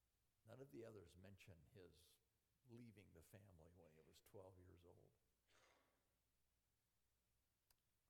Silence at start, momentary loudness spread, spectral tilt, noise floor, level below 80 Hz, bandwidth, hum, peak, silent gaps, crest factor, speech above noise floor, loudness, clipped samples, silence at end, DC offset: 0 s; 8 LU; -6 dB/octave; -90 dBFS; -86 dBFS; 16 kHz; none; -48 dBFS; none; 22 dB; 23 dB; -66 LUFS; under 0.1%; 0 s; under 0.1%